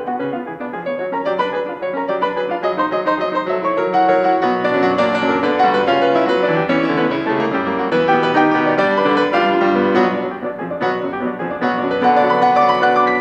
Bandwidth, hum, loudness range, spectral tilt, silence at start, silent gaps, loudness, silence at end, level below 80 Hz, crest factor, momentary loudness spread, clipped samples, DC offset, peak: 8.4 kHz; none; 4 LU; -6.5 dB/octave; 0 s; none; -17 LUFS; 0 s; -56 dBFS; 14 dB; 9 LU; under 0.1%; under 0.1%; -2 dBFS